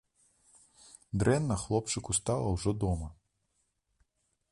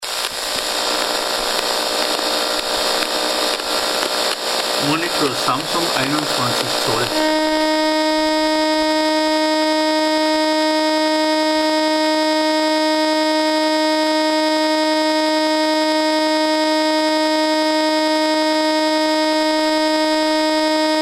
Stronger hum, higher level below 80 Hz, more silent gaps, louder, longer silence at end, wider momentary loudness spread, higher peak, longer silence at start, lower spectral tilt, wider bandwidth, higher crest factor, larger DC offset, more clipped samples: neither; about the same, -48 dBFS vs -52 dBFS; neither; second, -31 LUFS vs -17 LUFS; first, 1.4 s vs 0 s; first, 8 LU vs 2 LU; second, -14 dBFS vs 0 dBFS; first, 1.15 s vs 0 s; first, -5.5 dB/octave vs -2.5 dB/octave; second, 11.5 kHz vs 16 kHz; about the same, 20 dB vs 18 dB; neither; neither